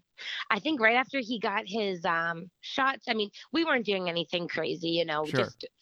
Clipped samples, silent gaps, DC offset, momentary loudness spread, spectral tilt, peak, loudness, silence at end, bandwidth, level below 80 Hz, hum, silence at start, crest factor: under 0.1%; none; under 0.1%; 9 LU; -5 dB/octave; -8 dBFS; -29 LUFS; 0.15 s; 11.5 kHz; -74 dBFS; none; 0.2 s; 22 dB